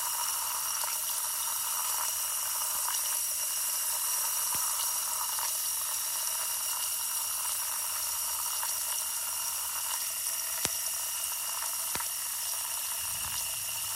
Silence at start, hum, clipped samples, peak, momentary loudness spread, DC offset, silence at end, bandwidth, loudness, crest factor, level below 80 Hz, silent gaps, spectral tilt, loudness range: 0 s; none; under 0.1%; -2 dBFS; 3 LU; under 0.1%; 0 s; 16.5 kHz; -29 LUFS; 30 dB; -68 dBFS; none; 2 dB/octave; 2 LU